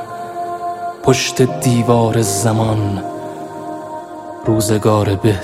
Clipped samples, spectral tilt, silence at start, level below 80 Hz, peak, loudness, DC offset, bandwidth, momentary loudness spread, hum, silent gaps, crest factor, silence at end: under 0.1%; -5.5 dB/octave; 0 s; -44 dBFS; 0 dBFS; -16 LUFS; under 0.1%; 15.5 kHz; 14 LU; none; none; 16 dB; 0 s